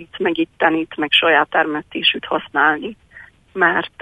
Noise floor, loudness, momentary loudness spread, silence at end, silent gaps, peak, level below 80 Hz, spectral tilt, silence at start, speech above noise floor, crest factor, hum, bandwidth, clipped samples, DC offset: -44 dBFS; -17 LUFS; 8 LU; 0.15 s; none; 0 dBFS; -56 dBFS; -5 dB/octave; 0 s; 26 dB; 18 dB; none; 9.8 kHz; under 0.1%; under 0.1%